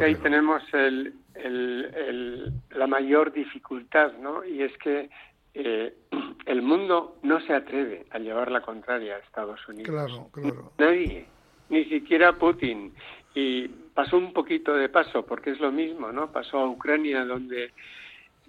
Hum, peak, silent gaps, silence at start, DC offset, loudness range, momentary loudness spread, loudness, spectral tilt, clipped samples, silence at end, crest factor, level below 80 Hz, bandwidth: none; -6 dBFS; none; 0 s; under 0.1%; 4 LU; 14 LU; -26 LUFS; -7 dB/octave; under 0.1%; 0.3 s; 20 dB; -54 dBFS; 5.4 kHz